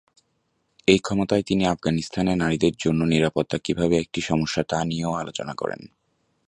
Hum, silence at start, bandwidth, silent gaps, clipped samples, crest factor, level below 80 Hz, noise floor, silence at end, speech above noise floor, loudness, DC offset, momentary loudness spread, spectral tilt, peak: none; 0.85 s; 10.5 kHz; none; under 0.1%; 22 dB; -48 dBFS; -71 dBFS; 0.6 s; 48 dB; -23 LUFS; under 0.1%; 9 LU; -5.5 dB/octave; -2 dBFS